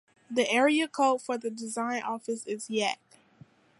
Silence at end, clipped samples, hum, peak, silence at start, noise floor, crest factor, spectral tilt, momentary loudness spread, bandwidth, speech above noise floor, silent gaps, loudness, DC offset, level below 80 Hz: 0.85 s; under 0.1%; none; -12 dBFS; 0.3 s; -57 dBFS; 18 dB; -3 dB/octave; 11 LU; 11.5 kHz; 29 dB; none; -29 LUFS; under 0.1%; -82 dBFS